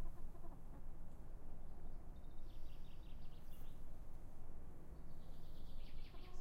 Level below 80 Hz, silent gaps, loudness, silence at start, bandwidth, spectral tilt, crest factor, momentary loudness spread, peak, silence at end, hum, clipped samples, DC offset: -50 dBFS; none; -59 LUFS; 0 s; 4.8 kHz; -6.5 dB/octave; 10 dB; 2 LU; -34 dBFS; 0 s; none; under 0.1%; under 0.1%